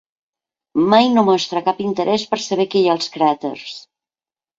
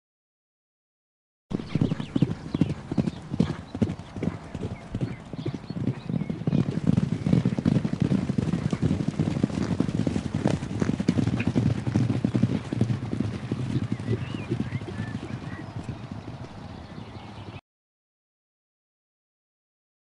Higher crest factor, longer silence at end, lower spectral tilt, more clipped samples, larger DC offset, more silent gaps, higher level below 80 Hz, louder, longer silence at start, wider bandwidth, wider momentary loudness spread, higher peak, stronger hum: about the same, 18 dB vs 22 dB; second, 0.8 s vs 2.5 s; second, -5 dB/octave vs -8 dB/octave; neither; neither; neither; second, -62 dBFS vs -48 dBFS; first, -17 LUFS vs -28 LUFS; second, 0.75 s vs 1.5 s; second, 7.8 kHz vs 11 kHz; about the same, 13 LU vs 13 LU; first, 0 dBFS vs -6 dBFS; neither